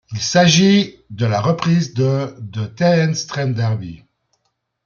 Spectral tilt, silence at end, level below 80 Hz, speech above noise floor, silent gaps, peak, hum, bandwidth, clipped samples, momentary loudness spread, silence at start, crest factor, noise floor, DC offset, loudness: -5 dB/octave; 0.9 s; -56 dBFS; 55 dB; none; -2 dBFS; none; 7.4 kHz; under 0.1%; 14 LU; 0.1 s; 16 dB; -71 dBFS; under 0.1%; -17 LUFS